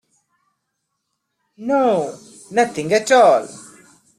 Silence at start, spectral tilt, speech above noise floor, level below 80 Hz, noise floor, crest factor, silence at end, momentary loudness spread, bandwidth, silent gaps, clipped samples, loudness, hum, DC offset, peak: 1.6 s; -4 dB/octave; 59 dB; -66 dBFS; -75 dBFS; 18 dB; 0.55 s; 17 LU; 14 kHz; none; under 0.1%; -17 LUFS; none; under 0.1%; -2 dBFS